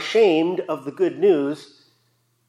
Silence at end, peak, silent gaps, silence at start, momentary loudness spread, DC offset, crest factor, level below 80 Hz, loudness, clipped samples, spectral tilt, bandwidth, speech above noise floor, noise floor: 0.85 s; -6 dBFS; none; 0 s; 11 LU; under 0.1%; 16 dB; -82 dBFS; -20 LUFS; under 0.1%; -5.5 dB/octave; 11.5 kHz; 46 dB; -66 dBFS